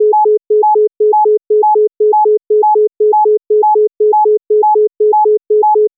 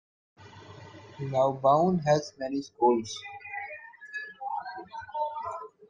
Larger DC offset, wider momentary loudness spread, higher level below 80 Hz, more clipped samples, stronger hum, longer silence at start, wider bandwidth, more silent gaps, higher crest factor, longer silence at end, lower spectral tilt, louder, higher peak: neither; second, 1 LU vs 20 LU; second, -88 dBFS vs -68 dBFS; neither; neither; second, 0 s vs 0.4 s; second, 1 kHz vs 9.4 kHz; neither; second, 4 dB vs 18 dB; about the same, 0.1 s vs 0.05 s; second, -4.5 dB/octave vs -6 dB/octave; first, -10 LUFS vs -29 LUFS; first, -6 dBFS vs -12 dBFS